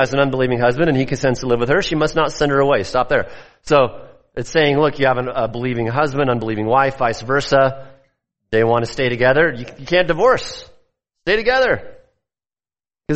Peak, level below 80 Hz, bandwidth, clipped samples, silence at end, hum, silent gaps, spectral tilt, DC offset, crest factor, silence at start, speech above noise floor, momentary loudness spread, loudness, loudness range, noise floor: -2 dBFS; -40 dBFS; 8.4 kHz; under 0.1%; 0 s; none; none; -5.5 dB/octave; under 0.1%; 16 dB; 0 s; over 73 dB; 7 LU; -17 LUFS; 1 LU; under -90 dBFS